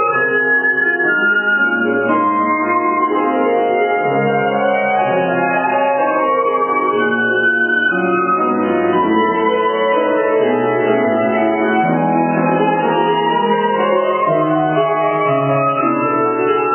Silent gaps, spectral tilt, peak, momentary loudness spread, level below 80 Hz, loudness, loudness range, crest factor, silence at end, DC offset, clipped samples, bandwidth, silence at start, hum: none; -9.5 dB/octave; -2 dBFS; 2 LU; -60 dBFS; -15 LUFS; 1 LU; 12 dB; 0 s; under 0.1%; under 0.1%; 3.3 kHz; 0 s; none